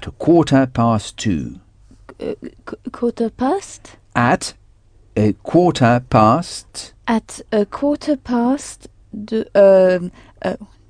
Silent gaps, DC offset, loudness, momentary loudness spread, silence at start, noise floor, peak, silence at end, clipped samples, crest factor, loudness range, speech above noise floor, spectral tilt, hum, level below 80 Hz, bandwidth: none; under 0.1%; -17 LUFS; 19 LU; 0 s; -49 dBFS; 0 dBFS; 0.25 s; under 0.1%; 18 dB; 5 LU; 32 dB; -6.5 dB/octave; none; -44 dBFS; 10 kHz